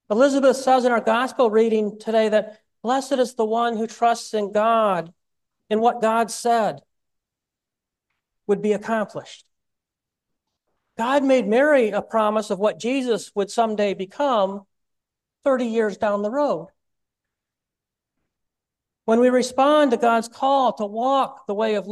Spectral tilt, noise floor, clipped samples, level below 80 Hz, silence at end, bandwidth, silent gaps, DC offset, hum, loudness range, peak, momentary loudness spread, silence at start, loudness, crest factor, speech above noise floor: -4.5 dB/octave; -86 dBFS; under 0.1%; -70 dBFS; 0 s; 12.5 kHz; none; under 0.1%; none; 8 LU; -6 dBFS; 9 LU; 0.1 s; -21 LUFS; 16 dB; 66 dB